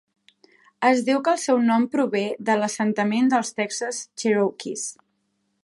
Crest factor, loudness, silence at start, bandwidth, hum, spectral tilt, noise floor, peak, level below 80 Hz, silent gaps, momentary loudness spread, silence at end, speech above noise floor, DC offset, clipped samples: 18 dB; -23 LUFS; 0.8 s; 11.5 kHz; none; -4 dB/octave; -72 dBFS; -6 dBFS; -76 dBFS; none; 9 LU; 0.7 s; 50 dB; under 0.1%; under 0.1%